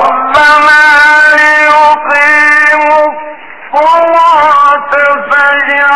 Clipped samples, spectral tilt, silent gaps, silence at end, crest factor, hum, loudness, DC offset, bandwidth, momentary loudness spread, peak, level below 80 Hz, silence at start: under 0.1%; -2 dB/octave; none; 0 s; 6 dB; none; -5 LUFS; 2%; 13 kHz; 6 LU; 0 dBFS; -44 dBFS; 0 s